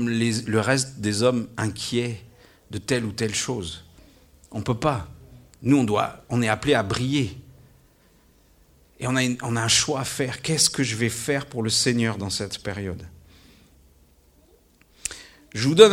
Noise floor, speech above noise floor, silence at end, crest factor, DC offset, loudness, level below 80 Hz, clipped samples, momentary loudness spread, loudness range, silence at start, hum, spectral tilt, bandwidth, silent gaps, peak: -58 dBFS; 35 dB; 0 s; 24 dB; under 0.1%; -24 LUFS; -52 dBFS; under 0.1%; 14 LU; 6 LU; 0 s; none; -4 dB/octave; 16.5 kHz; none; 0 dBFS